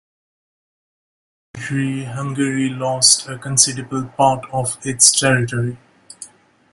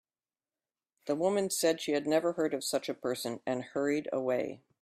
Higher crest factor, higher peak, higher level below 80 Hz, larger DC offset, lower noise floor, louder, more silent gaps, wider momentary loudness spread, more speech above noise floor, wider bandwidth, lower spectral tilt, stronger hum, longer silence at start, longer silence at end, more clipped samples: about the same, 20 dB vs 18 dB; first, 0 dBFS vs -14 dBFS; first, -54 dBFS vs -76 dBFS; neither; second, -42 dBFS vs under -90 dBFS; first, -16 LUFS vs -32 LUFS; neither; first, 14 LU vs 7 LU; second, 24 dB vs over 58 dB; about the same, 16 kHz vs 15.5 kHz; second, -2.5 dB/octave vs -4 dB/octave; neither; first, 1.55 s vs 1.05 s; first, 0.45 s vs 0.25 s; neither